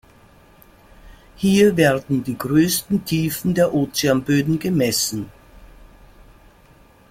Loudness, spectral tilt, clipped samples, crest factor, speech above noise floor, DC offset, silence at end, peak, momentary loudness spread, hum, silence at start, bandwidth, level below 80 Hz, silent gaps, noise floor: -19 LUFS; -5 dB/octave; under 0.1%; 18 dB; 32 dB; under 0.1%; 1.45 s; -2 dBFS; 8 LU; none; 1.05 s; 16.5 kHz; -48 dBFS; none; -50 dBFS